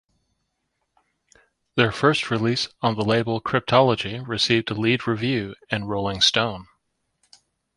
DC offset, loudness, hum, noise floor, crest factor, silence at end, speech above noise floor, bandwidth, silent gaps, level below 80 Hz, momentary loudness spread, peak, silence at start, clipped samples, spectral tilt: under 0.1%; -22 LUFS; none; -75 dBFS; 22 dB; 1.1 s; 54 dB; 11.5 kHz; none; -54 dBFS; 9 LU; -2 dBFS; 1.75 s; under 0.1%; -5 dB/octave